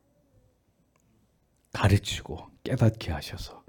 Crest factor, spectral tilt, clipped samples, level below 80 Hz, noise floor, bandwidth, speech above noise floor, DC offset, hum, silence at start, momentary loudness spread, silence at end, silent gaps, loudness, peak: 22 dB; -6 dB/octave; under 0.1%; -48 dBFS; -68 dBFS; 18 kHz; 40 dB; under 0.1%; none; 1.75 s; 15 LU; 0.1 s; none; -28 LUFS; -8 dBFS